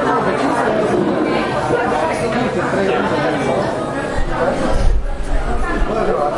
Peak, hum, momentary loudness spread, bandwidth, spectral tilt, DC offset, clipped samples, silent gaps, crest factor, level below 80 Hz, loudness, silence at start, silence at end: -2 dBFS; none; 5 LU; 11.5 kHz; -6 dB/octave; under 0.1%; under 0.1%; none; 14 dB; -24 dBFS; -18 LUFS; 0 s; 0 s